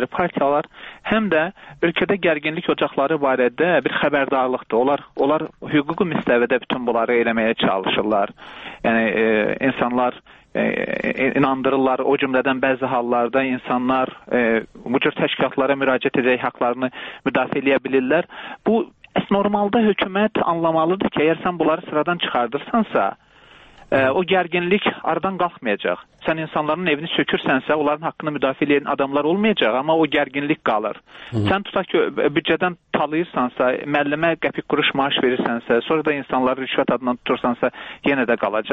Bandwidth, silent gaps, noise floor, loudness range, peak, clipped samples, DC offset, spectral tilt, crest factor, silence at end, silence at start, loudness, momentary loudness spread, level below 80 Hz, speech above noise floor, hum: 5.2 kHz; none; -48 dBFS; 2 LU; -2 dBFS; under 0.1%; under 0.1%; -8 dB/octave; 18 dB; 0 s; 0 s; -20 LUFS; 5 LU; -56 dBFS; 28 dB; none